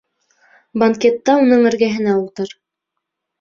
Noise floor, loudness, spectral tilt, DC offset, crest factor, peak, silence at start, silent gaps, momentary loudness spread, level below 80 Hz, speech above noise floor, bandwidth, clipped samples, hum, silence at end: -79 dBFS; -15 LUFS; -6 dB/octave; under 0.1%; 16 dB; -2 dBFS; 0.75 s; none; 15 LU; -60 dBFS; 64 dB; 7.4 kHz; under 0.1%; none; 0.9 s